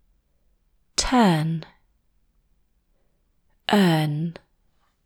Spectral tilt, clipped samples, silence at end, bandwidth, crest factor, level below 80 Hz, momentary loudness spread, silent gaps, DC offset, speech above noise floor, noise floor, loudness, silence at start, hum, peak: -5 dB/octave; under 0.1%; 0.75 s; 17.5 kHz; 20 dB; -46 dBFS; 14 LU; none; under 0.1%; 46 dB; -66 dBFS; -22 LUFS; 1 s; none; -6 dBFS